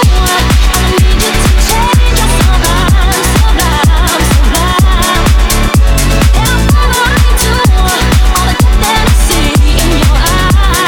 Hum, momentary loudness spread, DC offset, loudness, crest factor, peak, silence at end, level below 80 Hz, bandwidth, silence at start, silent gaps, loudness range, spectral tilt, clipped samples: none; 1 LU; under 0.1%; -9 LUFS; 6 dB; 0 dBFS; 0 s; -10 dBFS; 19 kHz; 0 s; none; 0 LU; -4 dB/octave; under 0.1%